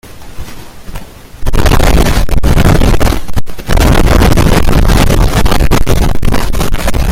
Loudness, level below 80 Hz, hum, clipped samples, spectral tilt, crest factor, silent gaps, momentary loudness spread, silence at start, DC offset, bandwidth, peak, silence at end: -11 LUFS; -12 dBFS; none; 0.8%; -5.5 dB/octave; 6 dB; none; 20 LU; 0.05 s; under 0.1%; 16.5 kHz; 0 dBFS; 0 s